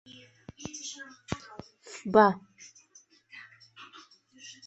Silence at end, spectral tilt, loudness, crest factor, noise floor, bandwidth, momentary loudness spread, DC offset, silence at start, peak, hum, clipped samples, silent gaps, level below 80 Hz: 0.15 s; -4.5 dB/octave; -28 LUFS; 28 dB; -61 dBFS; 8.2 kHz; 29 LU; under 0.1%; 0.6 s; -6 dBFS; none; under 0.1%; none; -64 dBFS